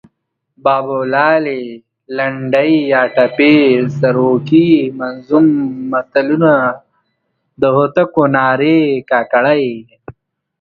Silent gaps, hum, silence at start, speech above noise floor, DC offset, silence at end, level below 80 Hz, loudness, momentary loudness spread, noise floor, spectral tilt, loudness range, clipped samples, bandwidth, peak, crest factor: none; none; 0.65 s; 56 dB; under 0.1%; 0.5 s; -56 dBFS; -13 LUFS; 9 LU; -68 dBFS; -8.5 dB/octave; 3 LU; under 0.1%; 5 kHz; 0 dBFS; 14 dB